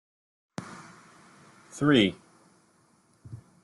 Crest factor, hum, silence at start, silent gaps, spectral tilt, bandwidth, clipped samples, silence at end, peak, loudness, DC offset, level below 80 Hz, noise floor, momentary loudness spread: 22 dB; none; 0.6 s; none; -5.5 dB/octave; 12 kHz; under 0.1%; 0.3 s; -10 dBFS; -24 LUFS; under 0.1%; -66 dBFS; -64 dBFS; 27 LU